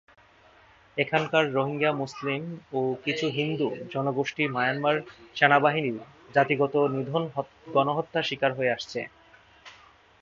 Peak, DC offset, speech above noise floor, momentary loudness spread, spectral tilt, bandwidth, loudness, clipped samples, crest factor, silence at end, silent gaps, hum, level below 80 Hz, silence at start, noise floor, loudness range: -2 dBFS; under 0.1%; 30 dB; 10 LU; -6 dB/octave; 7.6 kHz; -26 LUFS; under 0.1%; 26 dB; 0.5 s; none; none; -70 dBFS; 0.95 s; -56 dBFS; 3 LU